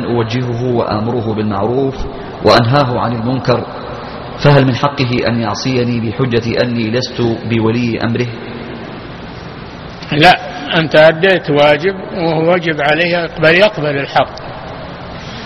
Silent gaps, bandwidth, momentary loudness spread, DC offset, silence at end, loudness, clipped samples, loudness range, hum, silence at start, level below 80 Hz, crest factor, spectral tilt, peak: none; 10.5 kHz; 18 LU; under 0.1%; 0 s; -13 LUFS; 0.2%; 5 LU; none; 0 s; -38 dBFS; 14 dB; -6.5 dB/octave; 0 dBFS